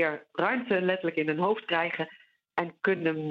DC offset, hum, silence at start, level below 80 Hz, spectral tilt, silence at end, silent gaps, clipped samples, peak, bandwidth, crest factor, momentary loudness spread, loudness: under 0.1%; none; 0 s; -78 dBFS; -8 dB/octave; 0 s; none; under 0.1%; -10 dBFS; 6 kHz; 18 dB; 7 LU; -29 LUFS